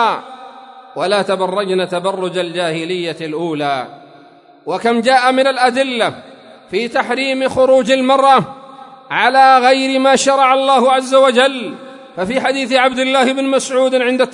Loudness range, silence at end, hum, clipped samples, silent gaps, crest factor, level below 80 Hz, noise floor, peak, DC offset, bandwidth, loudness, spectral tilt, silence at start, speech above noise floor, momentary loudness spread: 7 LU; 0 s; none; under 0.1%; none; 14 dB; -60 dBFS; -44 dBFS; 0 dBFS; under 0.1%; 11 kHz; -14 LUFS; -3.5 dB/octave; 0 s; 30 dB; 13 LU